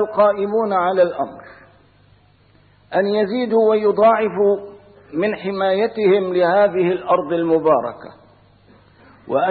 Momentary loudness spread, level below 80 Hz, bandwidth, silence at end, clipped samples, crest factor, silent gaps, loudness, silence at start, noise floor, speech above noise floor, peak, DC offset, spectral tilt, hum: 9 LU; -60 dBFS; 4.7 kHz; 0 s; under 0.1%; 14 dB; none; -18 LUFS; 0 s; -53 dBFS; 36 dB; -4 dBFS; under 0.1%; -11 dB/octave; none